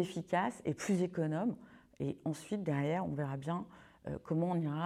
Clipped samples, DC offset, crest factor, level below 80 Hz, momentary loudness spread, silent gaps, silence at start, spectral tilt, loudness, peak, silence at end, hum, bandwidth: under 0.1%; under 0.1%; 16 dB; -68 dBFS; 10 LU; none; 0 s; -7 dB/octave; -37 LUFS; -20 dBFS; 0 s; none; 13.5 kHz